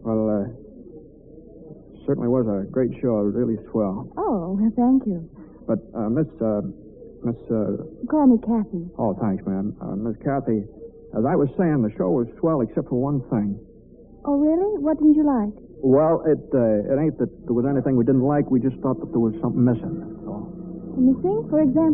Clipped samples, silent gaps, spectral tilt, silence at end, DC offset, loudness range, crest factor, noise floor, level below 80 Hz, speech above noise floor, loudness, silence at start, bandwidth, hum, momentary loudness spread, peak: under 0.1%; none; -8 dB/octave; 0 s; under 0.1%; 4 LU; 16 dB; -47 dBFS; -48 dBFS; 26 dB; -22 LUFS; 0 s; 2.7 kHz; none; 13 LU; -6 dBFS